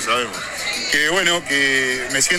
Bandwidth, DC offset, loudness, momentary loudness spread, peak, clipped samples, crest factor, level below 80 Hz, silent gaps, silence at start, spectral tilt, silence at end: 18 kHz; under 0.1%; -18 LUFS; 8 LU; -2 dBFS; under 0.1%; 18 dB; -48 dBFS; none; 0 s; -1 dB/octave; 0 s